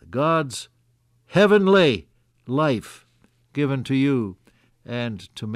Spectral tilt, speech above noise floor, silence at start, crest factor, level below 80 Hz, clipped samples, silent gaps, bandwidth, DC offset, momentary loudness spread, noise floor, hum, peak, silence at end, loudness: -6 dB/octave; 43 dB; 0.1 s; 16 dB; -58 dBFS; under 0.1%; none; 13.5 kHz; under 0.1%; 17 LU; -63 dBFS; none; -6 dBFS; 0 s; -21 LUFS